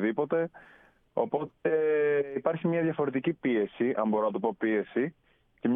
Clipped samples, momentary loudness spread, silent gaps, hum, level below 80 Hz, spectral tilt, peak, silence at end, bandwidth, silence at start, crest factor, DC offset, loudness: under 0.1%; 6 LU; none; none; -72 dBFS; -10.5 dB/octave; -12 dBFS; 0 s; 3.8 kHz; 0 s; 16 dB; under 0.1%; -29 LUFS